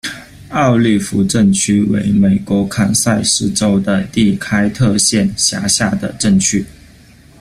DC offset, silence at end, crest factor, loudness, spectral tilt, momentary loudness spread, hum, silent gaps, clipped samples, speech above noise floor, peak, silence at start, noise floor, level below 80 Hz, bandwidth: under 0.1%; 0.7 s; 14 dB; -13 LUFS; -4 dB/octave; 5 LU; none; none; under 0.1%; 29 dB; 0 dBFS; 0.05 s; -42 dBFS; -42 dBFS; 15 kHz